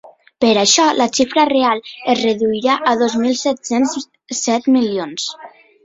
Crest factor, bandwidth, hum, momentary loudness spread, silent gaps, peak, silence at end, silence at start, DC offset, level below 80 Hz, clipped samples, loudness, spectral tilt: 16 dB; 8 kHz; none; 11 LU; none; 0 dBFS; 0.35 s; 0.05 s; under 0.1%; -58 dBFS; under 0.1%; -16 LUFS; -2.5 dB/octave